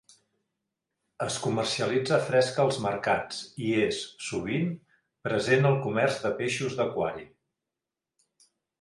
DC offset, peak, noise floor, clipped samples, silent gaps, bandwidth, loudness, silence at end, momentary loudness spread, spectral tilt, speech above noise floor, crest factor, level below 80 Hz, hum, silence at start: under 0.1%; -10 dBFS; -89 dBFS; under 0.1%; none; 11.5 kHz; -28 LUFS; 1.55 s; 10 LU; -5 dB/octave; 62 dB; 18 dB; -64 dBFS; none; 1.2 s